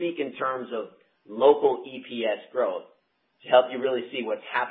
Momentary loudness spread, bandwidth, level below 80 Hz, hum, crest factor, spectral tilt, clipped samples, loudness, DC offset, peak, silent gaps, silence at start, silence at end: 15 LU; 4.2 kHz; -90 dBFS; none; 22 dB; -8.5 dB/octave; under 0.1%; -26 LUFS; under 0.1%; -4 dBFS; none; 0 s; 0 s